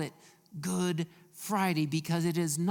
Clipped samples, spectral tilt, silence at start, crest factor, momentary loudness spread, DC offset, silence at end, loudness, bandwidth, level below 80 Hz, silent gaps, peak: under 0.1%; -5 dB/octave; 0 s; 18 dB; 11 LU; under 0.1%; 0 s; -32 LUFS; 18 kHz; -74 dBFS; none; -14 dBFS